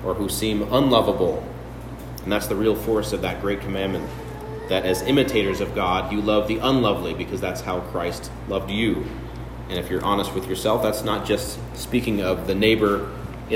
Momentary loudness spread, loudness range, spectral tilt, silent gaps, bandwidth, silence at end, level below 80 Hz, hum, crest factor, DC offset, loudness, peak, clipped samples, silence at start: 14 LU; 4 LU; -5 dB/octave; none; 16.5 kHz; 0 s; -38 dBFS; none; 20 dB; under 0.1%; -23 LUFS; -4 dBFS; under 0.1%; 0 s